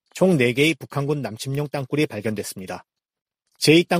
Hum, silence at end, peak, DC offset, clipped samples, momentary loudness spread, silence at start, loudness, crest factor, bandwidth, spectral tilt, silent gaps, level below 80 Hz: none; 0 s; -2 dBFS; under 0.1%; under 0.1%; 14 LU; 0.15 s; -22 LUFS; 20 dB; 15.5 kHz; -5 dB/octave; 3.22-3.26 s; -60 dBFS